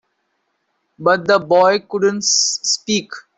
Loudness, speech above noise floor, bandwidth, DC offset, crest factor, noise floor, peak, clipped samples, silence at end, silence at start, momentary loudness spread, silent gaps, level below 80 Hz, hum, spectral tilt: -15 LUFS; 53 dB; 8.4 kHz; under 0.1%; 14 dB; -69 dBFS; -2 dBFS; under 0.1%; 0.2 s; 1 s; 7 LU; none; -62 dBFS; none; -2 dB/octave